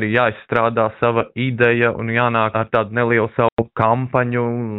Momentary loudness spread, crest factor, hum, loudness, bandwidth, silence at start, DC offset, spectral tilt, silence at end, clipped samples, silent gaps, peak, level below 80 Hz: 3 LU; 16 dB; none; -18 LUFS; 4.1 kHz; 0 s; under 0.1%; -9.5 dB/octave; 0 s; under 0.1%; 3.52-3.57 s; -2 dBFS; -50 dBFS